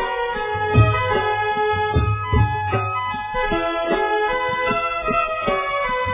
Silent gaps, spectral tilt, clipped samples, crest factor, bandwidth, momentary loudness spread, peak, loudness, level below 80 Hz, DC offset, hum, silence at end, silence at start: none; -10 dB/octave; under 0.1%; 16 dB; 3.8 kHz; 6 LU; -4 dBFS; -20 LUFS; -32 dBFS; under 0.1%; none; 0 s; 0 s